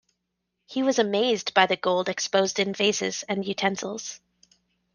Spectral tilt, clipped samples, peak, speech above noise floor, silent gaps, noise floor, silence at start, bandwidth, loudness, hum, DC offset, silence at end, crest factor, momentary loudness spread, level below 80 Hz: -3 dB/octave; under 0.1%; -2 dBFS; 55 dB; none; -80 dBFS; 0.7 s; 10.5 kHz; -25 LUFS; 60 Hz at -55 dBFS; under 0.1%; 0.75 s; 24 dB; 12 LU; -72 dBFS